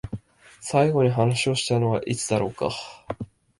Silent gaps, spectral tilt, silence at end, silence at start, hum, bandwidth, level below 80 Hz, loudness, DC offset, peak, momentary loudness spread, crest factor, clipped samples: none; -5 dB/octave; 0.35 s; 0.05 s; none; 11.5 kHz; -52 dBFS; -23 LUFS; under 0.1%; -6 dBFS; 16 LU; 18 dB; under 0.1%